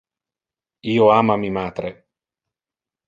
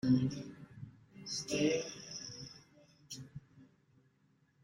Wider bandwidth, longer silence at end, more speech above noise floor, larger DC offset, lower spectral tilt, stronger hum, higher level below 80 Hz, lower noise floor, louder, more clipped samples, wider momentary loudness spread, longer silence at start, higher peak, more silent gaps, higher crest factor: second, 7.4 kHz vs 16 kHz; first, 1.15 s vs 1 s; first, over 72 dB vs 39 dB; neither; first, -8 dB/octave vs -5 dB/octave; neither; first, -54 dBFS vs -70 dBFS; first, under -90 dBFS vs -73 dBFS; first, -18 LUFS vs -38 LUFS; neither; second, 17 LU vs 21 LU; first, 0.85 s vs 0.05 s; first, -2 dBFS vs -20 dBFS; neither; about the same, 20 dB vs 20 dB